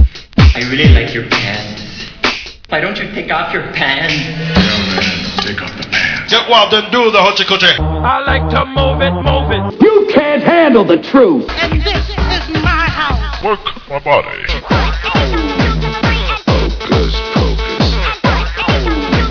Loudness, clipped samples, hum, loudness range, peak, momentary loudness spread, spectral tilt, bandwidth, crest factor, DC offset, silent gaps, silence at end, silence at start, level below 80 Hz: -12 LUFS; 0.4%; none; 4 LU; 0 dBFS; 8 LU; -5.5 dB/octave; 5.4 kHz; 12 dB; under 0.1%; none; 0 s; 0 s; -20 dBFS